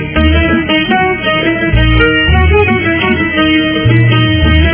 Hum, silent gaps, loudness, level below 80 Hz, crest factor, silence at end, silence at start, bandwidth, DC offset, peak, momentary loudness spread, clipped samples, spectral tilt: none; none; -9 LUFS; -16 dBFS; 10 dB; 0 s; 0 s; 4 kHz; under 0.1%; 0 dBFS; 3 LU; 0.2%; -10 dB/octave